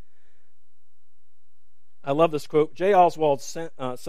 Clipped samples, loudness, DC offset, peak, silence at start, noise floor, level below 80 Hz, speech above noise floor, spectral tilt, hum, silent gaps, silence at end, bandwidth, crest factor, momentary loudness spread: under 0.1%; -22 LUFS; 2%; -4 dBFS; 2.05 s; -76 dBFS; -70 dBFS; 53 dB; -5.5 dB/octave; none; none; 0 s; 15 kHz; 20 dB; 15 LU